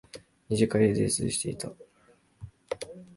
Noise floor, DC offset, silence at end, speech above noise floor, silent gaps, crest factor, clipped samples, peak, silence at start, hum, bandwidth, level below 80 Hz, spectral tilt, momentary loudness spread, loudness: -63 dBFS; under 0.1%; 0.1 s; 37 dB; none; 20 dB; under 0.1%; -10 dBFS; 0.15 s; none; 11.5 kHz; -56 dBFS; -5 dB/octave; 25 LU; -28 LUFS